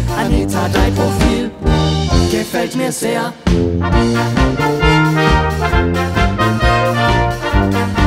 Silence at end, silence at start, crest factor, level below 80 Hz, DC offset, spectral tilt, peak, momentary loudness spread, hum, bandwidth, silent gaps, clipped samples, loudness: 0 s; 0 s; 14 dB; -22 dBFS; under 0.1%; -5.5 dB/octave; 0 dBFS; 5 LU; none; 16 kHz; none; under 0.1%; -14 LUFS